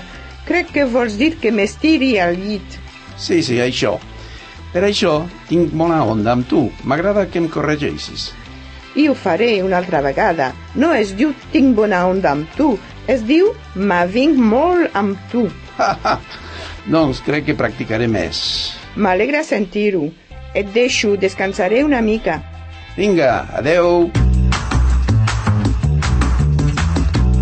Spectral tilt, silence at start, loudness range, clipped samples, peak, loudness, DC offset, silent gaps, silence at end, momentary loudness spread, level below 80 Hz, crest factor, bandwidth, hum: -6 dB/octave; 0 s; 3 LU; under 0.1%; -2 dBFS; -16 LUFS; under 0.1%; none; 0 s; 11 LU; -26 dBFS; 14 dB; 8.8 kHz; none